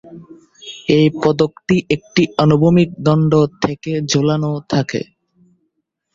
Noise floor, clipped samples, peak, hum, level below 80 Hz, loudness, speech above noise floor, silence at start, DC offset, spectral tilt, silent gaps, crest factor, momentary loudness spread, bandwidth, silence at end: -71 dBFS; under 0.1%; 0 dBFS; none; -50 dBFS; -16 LUFS; 56 dB; 0.05 s; under 0.1%; -6.5 dB/octave; none; 16 dB; 11 LU; 7.6 kHz; 1.1 s